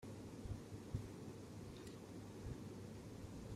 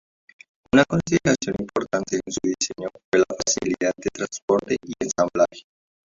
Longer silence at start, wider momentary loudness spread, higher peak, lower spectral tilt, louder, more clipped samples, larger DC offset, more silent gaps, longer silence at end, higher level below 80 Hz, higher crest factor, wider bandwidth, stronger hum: second, 0 s vs 0.75 s; second, 4 LU vs 8 LU; second, -30 dBFS vs -2 dBFS; first, -6.5 dB/octave vs -4 dB/octave; second, -53 LUFS vs -23 LUFS; neither; neither; second, none vs 3.04-3.12 s, 4.42-4.48 s; second, 0 s vs 0.55 s; second, -62 dBFS vs -52 dBFS; about the same, 20 dB vs 22 dB; first, 15.5 kHz vs 7.8 kHz; neither